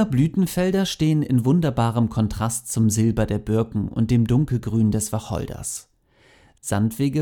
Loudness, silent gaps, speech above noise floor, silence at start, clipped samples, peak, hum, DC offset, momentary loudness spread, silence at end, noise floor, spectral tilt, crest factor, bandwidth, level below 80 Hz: -22 LUFS; none; 36 dB; 0 s; under 0.1%; -6 dBFS; none; under 0.1%; 8 LU; 0 s; -57 dBFS; -6.5 dB/octave; 16 dB; 18.5 kHz; -42 dBFS